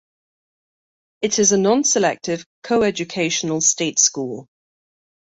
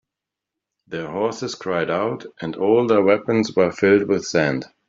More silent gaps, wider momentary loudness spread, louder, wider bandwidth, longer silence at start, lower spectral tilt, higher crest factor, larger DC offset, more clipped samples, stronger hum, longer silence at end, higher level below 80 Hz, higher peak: first, 2.46-2.62 s vs none; about the same, 12 LU vs 12 LU; about the same, -18 LUFS vs -20 LUFS; about the same, 8.2 kHz vs 7.8 kHz; first, 1.2 s vs 0.9 s; second, -2.5 dB/octave vs -5.5 dB/octave; about the same, 18 dB vs 18 dB; neither; neither; neither; first, 0.8 s vs 0.2 s; about the same, -60 dBFS vs -62 dBFS; about the same, -2 dBFS vs -2 dBFS